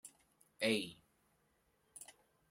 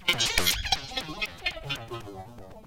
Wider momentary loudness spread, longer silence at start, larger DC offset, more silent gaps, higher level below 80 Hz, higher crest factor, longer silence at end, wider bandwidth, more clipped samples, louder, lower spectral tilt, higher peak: first, 22 LU vs 19 LU; about the same, 0.05 s vs 0 s; neither; neither; second, -82 dBFS vs -44 dBFS; about the same, 26 dB vs 24 dB; first, 0.4 s vs 0 s; about the same, 16 kHz vs 17 kHz; neither; second, -38 LUFS vs -28 LUFS; first, -3.5 dB/octave vs -1.5 dB/octave; second, -20 dBFS vs -8 dBFS